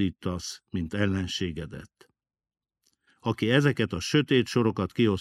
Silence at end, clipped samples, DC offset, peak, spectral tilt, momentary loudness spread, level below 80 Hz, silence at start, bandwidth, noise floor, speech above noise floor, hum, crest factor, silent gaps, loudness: 0 s; under 0.1%; under 0.1%; -8 dBFS; -5.5 dB/octave; 12 LU; -54 dBFS; 0 s; 14 kHz; -79 dBFS; 53 dB; none; 20 dB; none; -27 LUFS